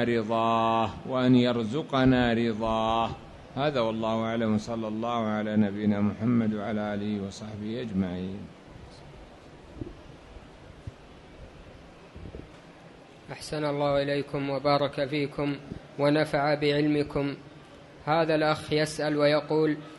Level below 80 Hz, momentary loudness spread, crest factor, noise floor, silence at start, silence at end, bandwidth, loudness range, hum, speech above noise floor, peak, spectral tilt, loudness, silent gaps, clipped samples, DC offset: -52 dBFS; 22 LU; 18 dB; -50 dBFS; 0 s; 0 s; 11.5 kHz; 20 LU; none; 23 dB; -10 dBFS; -6.5 dB/octave; -27 LUFS; none; under 0.1%; under 0.1%